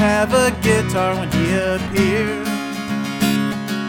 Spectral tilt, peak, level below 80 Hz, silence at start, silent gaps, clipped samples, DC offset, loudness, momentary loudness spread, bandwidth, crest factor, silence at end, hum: -5 dB/octave; -4 dBFS; -38 dBFS; 0 s; none; under 0.1%; under 0.1%; -18 LUFS; 8 LU; 19 kHz; 14 dB; 0 s; none